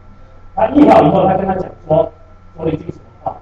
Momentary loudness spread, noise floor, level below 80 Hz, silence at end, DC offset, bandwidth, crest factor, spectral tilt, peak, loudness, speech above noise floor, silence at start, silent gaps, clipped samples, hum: 19 LU; -37 dBFS; -38 dBFS; 0.05 s; under 0.1%; 7.6 kHz; 14 dB; -9 dB/octave; 0 dBFS; -13 LUFS; 25 dB; 0.05 s; none; under 0.1%; none